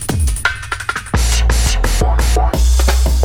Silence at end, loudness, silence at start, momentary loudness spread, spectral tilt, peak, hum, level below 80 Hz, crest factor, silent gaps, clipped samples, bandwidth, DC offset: 0 s; -15 LUFS; 0 s; 5 LU; -4 dB/octave; 0 dBFS; none; -14 dBFS; 12 dB; none; under 0.1%; 16.5 kHz; under 0.1%